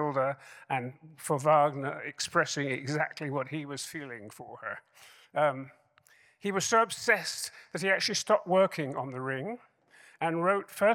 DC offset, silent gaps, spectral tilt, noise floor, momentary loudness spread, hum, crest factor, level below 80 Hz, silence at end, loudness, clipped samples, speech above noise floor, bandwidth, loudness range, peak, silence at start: under 0.1%; none; -4 dB/octave; -63 dBFS; 16 LU; none; 20 dB; -80 dBFS; 0 s; -30 LUFS; under 0.1%; 33 dB; 17.5 kHz; 7 LU; -10 dBFS; 0 s